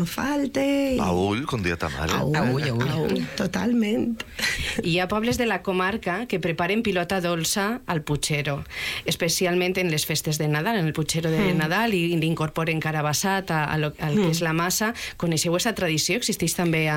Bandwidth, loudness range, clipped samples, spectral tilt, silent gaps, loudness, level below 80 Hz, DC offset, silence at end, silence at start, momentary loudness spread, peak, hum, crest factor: 17 kHz; 1 LU; under 0.1%; -4.5 dB/octave; none; -24 LUFS; -46 dBFS; under 0.1%; 0 s; 0 s; 4 LU; -10 dBFS; none; 14 dB